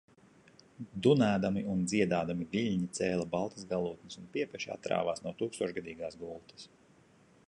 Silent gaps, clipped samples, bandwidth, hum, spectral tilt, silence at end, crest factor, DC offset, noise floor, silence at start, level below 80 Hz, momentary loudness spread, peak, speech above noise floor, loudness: none; under 0.1%; 11 kHz; none; -6 dB/octave; 0.8 s; 22 dB; under 0.1%; -63 dBFS; 0.8 s; -64 dBFS; 17 LU; -12 dBFS; 30 dB; -33 LUFS